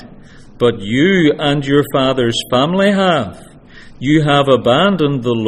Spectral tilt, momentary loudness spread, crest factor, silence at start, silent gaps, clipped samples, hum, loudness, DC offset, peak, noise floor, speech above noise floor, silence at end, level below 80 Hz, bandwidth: -6 dB/octave; 5 LU; 14 dB; 0 s; none; under 0.1%; none; -13 LUFS; under 0.1%; 0 dBFS; -38 dBFS; 25 dB; 0 s; -42 dBFS; 16 kHz